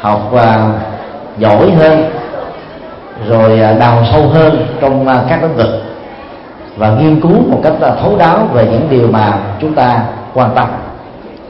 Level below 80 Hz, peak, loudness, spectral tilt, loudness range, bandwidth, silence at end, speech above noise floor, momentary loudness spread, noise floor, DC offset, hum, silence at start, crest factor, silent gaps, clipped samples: -36 dBFS; 0 dBFS; -9 LUFS; -10 dB/octave; 2 LU; 5.8 kHz; 0 s; 21 dB; 20 LU; -29 dBFS; under 0.1%; none; 0 s; 10 dB; none; 0.2%